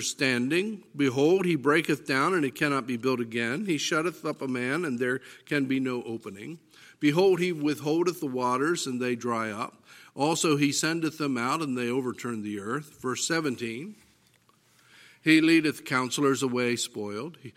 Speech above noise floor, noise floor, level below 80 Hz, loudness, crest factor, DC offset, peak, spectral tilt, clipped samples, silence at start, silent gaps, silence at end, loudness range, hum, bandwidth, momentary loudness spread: 37 dB; -64 dBFS; -76 dBFS; -27 LUFS; 20 dB; under 0.1%; -6 dBFS; -4.5 dB/octave; under 0.1%; 0 s; none; 0.05 s; 4 LU; none; 16 kHz; 11 LU